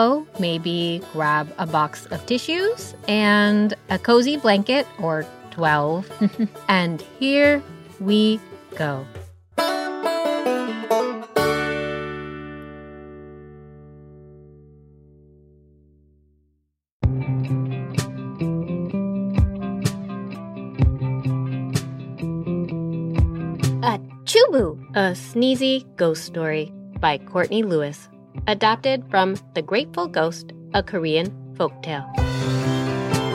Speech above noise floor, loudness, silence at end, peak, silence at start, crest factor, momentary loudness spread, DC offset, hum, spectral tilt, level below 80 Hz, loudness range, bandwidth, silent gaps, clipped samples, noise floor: 49 dB; -22 LUFS; 0 s; -2 dBFS; 0 s; 20 dB; 14 LU; under 0.1%; none; -6 dB/octave; -38 dBFS; 8 LU; 16 kHz; 16.92-17.00 s; under 0.1%; -70 dBFS